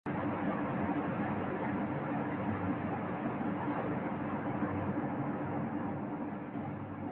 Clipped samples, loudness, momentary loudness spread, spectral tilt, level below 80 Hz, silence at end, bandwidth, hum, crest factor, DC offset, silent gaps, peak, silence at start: under 0.1%; -36 LUFS; 5 LU; -7.5 dB/octave; -60 dBFS; 0 s; 4.2 kHz; none; 14 dB; under 0.1%; none; -22 dBFS; 0.05 s